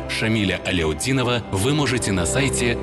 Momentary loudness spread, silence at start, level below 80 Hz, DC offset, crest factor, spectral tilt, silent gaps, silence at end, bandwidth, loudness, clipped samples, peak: 2 LU; 0 s; -36 dBFS; under 0.1%; 12 dB; -4.5 dB/octave; none; 0 s; 12.5 kHz; -21 LUFS; under 0.1%; -8 dBFS